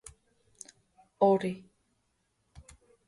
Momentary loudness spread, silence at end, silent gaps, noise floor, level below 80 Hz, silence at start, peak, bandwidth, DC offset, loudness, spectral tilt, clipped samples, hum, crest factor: 25 LU; 1.5 s; none; -76 dBFS; -66 dBFS; 1.2 s; -12 dBFS; 11.5 kHz; under 0.1%; -28 LUFS; -6.5 dB/octave; under 0.1%; none; 22 dB